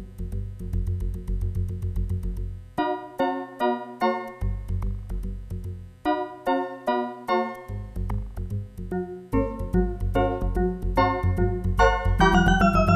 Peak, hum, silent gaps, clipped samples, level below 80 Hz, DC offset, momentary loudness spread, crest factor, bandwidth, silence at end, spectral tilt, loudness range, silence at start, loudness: -6 dBFS; none; none; under 0.1%; -30 dBFS; under 0.1%; 13 LU; 18 dB; 14 kHz; 0 s; -7 dB/octave; 6 LU; 0 s; -26 LUFS